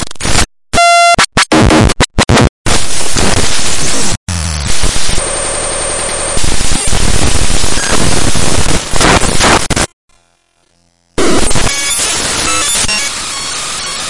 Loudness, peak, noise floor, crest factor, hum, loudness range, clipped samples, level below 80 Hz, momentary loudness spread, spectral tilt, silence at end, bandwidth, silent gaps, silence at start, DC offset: -11 LUFS; 0 dBFS; -55 dBFS; 10 dB; none; 4 LU; 0.3%; -20 dBFS; 7 LU; -3 dB/octave; 0 s; 12 kHz; 2.49-2.65 s, 4.17-4.27 s, 9.93-10.08 s; 0 s; 10%